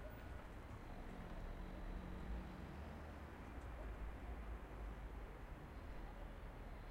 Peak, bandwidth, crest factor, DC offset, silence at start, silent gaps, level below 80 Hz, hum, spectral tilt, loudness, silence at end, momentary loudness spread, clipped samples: -38 dBFS; 16 kHz; 14 dB; under 0.1%; 0 s; none; -52 dBFS; none; -7 dB/octave; -54 LUFS; 0 s; 4 LU; under 0.1%